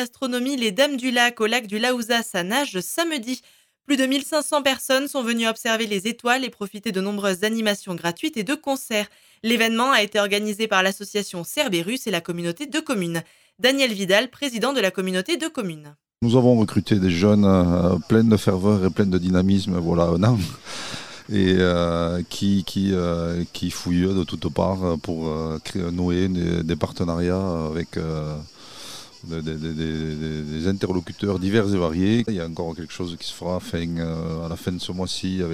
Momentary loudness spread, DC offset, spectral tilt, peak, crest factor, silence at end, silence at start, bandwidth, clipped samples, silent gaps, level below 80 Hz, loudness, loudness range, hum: 11 LU; under 0.1%; -5 dB/octave; -2 dBFS; 20 dB; 0 s; 0 s; 18 kHz; under 0.1%; none; -46 dBFS; -22 LUFS; 7 LU; none